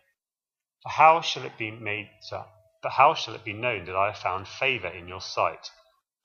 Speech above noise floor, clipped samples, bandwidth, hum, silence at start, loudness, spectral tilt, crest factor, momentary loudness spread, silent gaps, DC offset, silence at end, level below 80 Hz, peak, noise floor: over 64 dB; under 0.1%; 7.2 kHz; none; 0.85 s; -25 LUFS; -3.5 dB/octave; 24 dB; 20 LU; none; under 0.1%; 0.55 s; -66 dBFS; -4 dBFS; under -90 dBFS